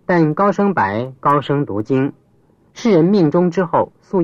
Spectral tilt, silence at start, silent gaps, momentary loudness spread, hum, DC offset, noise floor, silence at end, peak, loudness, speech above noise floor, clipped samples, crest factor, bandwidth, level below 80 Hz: -8 dB/octave; 0.1 s; none; 6 LU; none; under 0.1%; -54 dBFS; 0 s; -2 dBFS; -16 LUFS; 39 dB; under 0.1%; 14 dB; 7.4 kHz; -56 dBFS